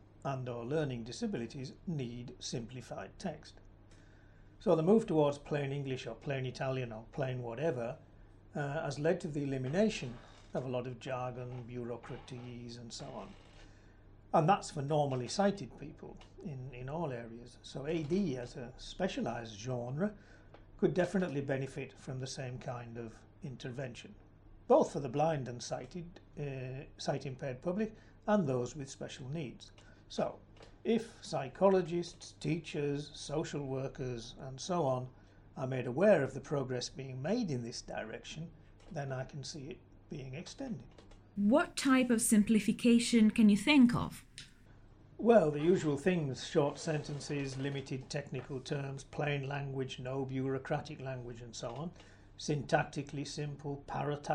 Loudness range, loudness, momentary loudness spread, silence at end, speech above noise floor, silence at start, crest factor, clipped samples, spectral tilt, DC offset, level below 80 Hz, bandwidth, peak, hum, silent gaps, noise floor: 11 LU; -35 LUFS; 18 LU; 0 s; 24 dB; 0.15 s; 22 dB; under 0.1%; -6 dB/octave; under 0.1%; -60 dBFS; 15.5 kHz; -14 dBFS; none; none; -58 dBFS